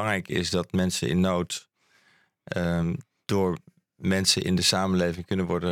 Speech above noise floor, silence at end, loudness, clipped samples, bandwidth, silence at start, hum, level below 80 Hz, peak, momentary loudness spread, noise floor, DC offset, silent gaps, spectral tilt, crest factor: 38 dB; 0 s; -26 LUFS; under 0.1%; 17 kHz; 0 s; none; -52 dBFS; -8 dBFS; 11 LU; -64 dBFS; under 0.1%; none; -4.5 dB/octave; 18 dB